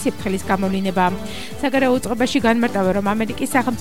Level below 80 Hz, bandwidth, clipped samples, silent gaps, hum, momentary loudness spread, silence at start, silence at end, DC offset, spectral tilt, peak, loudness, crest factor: -44 dBFS; 16.5 kHz; under 0.1%; none; none; 6 LU; 0 s; 0 s; 2%; -5 dB/octave; -2 dBFS; -19 LUFS; 16 dB